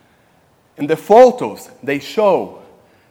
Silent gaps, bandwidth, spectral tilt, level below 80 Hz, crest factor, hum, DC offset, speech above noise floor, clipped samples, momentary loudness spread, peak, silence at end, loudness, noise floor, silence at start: none; 16.5 kHz; -5.5 dB/octave; -62 dBFS; 16 dB; none; under 0.1%; 41 dB; 0.3%; 18 LU; 0 dBFS; 0.6 s; -14 LUFS; -54 dBFS; 0.8 s